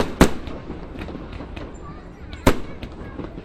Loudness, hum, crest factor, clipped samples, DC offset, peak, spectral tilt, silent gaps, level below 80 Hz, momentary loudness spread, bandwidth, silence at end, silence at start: -26 LUFS; none; 24 dB; under 0.1%; under 0.1%; 0 dBFS; -5.5 dB/octave; none; -32 dBFS; 19 LU; 15 kHz; 0 s; 0 s